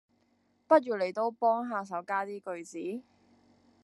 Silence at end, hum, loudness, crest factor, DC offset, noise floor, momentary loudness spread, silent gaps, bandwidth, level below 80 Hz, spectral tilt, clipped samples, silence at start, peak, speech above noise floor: 0.8 s; none; -31 LUFS; 22 dB; under 0.1%; -71 dBFS; 14 LU; none; 11.5 kHz; -88 dBFS; -5.5 dB/octave; under 0.1%; 0.7 s; -10 dBFS; 41 dB